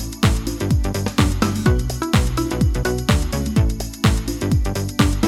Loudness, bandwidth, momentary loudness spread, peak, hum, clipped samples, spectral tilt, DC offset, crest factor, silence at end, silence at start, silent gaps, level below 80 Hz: -20 LUFS; 16 kHz; 3 LU; -2 dBFS; none; under 0.1%; -5.5 dB/octave; under 0.1%; 16 dB; 0 s; 0 s; none; -24 dBFS